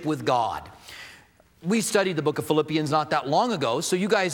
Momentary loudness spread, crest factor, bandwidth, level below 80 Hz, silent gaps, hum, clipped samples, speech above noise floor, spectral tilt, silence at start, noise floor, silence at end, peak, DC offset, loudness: 18 LU; 18 dB; 19.5 kHz; -62 dBFS; none; none; under 0.1%; 30 dB; -4.5 dB/octave; 0 s; -54 dBFS; 0 s; -8 dBFS; under 0.1%; -24 LUFS